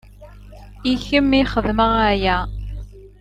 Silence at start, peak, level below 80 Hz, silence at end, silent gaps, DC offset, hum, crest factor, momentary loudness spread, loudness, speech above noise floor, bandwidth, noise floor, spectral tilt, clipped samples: 0.2 s; -2 dBFS; -32 dBFS; 0.15 s; none; under 0.1%; 50 Hz at -30 dBFS; 18 dB; 16 LU; -18 LUFS; 23 dB; 10 kHz; -41 dBFS; -6.5 dB/octave; under 0.1%